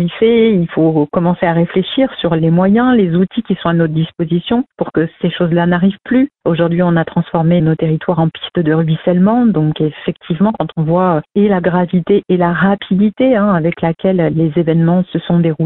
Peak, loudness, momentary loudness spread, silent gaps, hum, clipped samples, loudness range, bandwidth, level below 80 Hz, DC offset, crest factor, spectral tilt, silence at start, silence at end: 0 dBFS; -13 LUFS; 5 LU; none; none; under 0.1%; 2 LU; 4.1 kHz; -44 dBFS; under 0.1%; 12 dB; -12.5 dB/octave; 0 s; 0 s